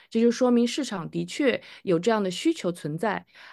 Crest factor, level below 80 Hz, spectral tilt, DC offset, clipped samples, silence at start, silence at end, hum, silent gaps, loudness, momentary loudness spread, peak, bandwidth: 16 dB; -70 dBFS; -5 dB/octave; under 0.1%; under 0.1%; 0.1 s; 0 s; none; none; -26 LUFS; 9 LU; -8 dBFS; 12.5 kHz